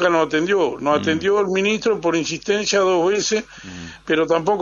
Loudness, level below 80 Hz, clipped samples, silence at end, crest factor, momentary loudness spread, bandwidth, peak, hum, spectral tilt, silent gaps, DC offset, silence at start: -19 LUFS; -54 dBFS; under 0.1%; 0 s; 16 dB; 7 LU; 7.6 kHz; -4 dBFS; none; -4 dB/octave; none; under 0.1%; 0 s